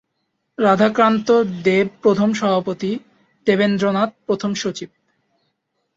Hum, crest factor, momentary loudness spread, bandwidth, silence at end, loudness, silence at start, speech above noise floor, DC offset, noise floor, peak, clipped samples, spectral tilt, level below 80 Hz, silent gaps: none; 18 dB; 11 LU; 7.8 kHz; 1.1 s; -18 LUFS; 0.6 s; 55 dB; under 0.1%; -73 dBFS; -2 dBFS; under 0.1%; -6 dB/octave; -60 dBFS; none